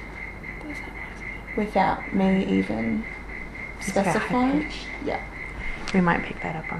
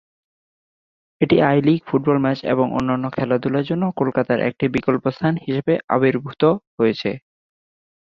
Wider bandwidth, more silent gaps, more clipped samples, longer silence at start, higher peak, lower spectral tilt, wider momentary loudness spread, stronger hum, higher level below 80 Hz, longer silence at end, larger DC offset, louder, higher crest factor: first, 12.5 kHz vs 7 kHz; second, none vs 5.84-5.88 s, 6.67-6.78 s; neither; second, 0 s vs 1.2 s; second, -8 dBFS vs -4 dBFS; second, -6 dB/octave vs -8.5 dB/octave; first, 13 LU vs 6 LU; neither; first, -40 dBFS vs -54 dBFS; second, 0 s vs 0.9 s; neither; second, -26 LUFS vs -20 LUFS; about the same, 18 dB vs 16 dB